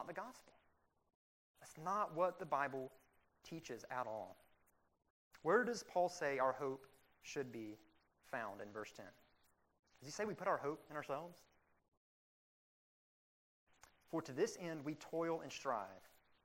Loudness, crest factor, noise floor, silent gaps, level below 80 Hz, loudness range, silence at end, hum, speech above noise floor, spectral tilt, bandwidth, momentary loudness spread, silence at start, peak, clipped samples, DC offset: -43 LUFS; 24 dB; -77 dBFS; 1.15-1.54 s, 5.10-5.31 s, 9.79-9.83 s, 11.88-13.67 s; -84 dBFS; 9 LU; 0.35 s; none; 34 dB; -4.5 dB/octave; 16 kHz; 18 LU; 0 s; -22 dBFS; under 0.1%; under 0.1%